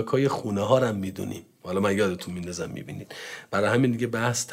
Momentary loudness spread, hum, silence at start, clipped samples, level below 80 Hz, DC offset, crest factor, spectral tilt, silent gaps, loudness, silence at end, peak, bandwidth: 15 LU; none; 0 s; under 0.1%; -64 dBFS; under 0.1%; 18 dB; -5.5 dB/octave; none; -26 LUFS; 0 s; -8 dBFS; 16 kHz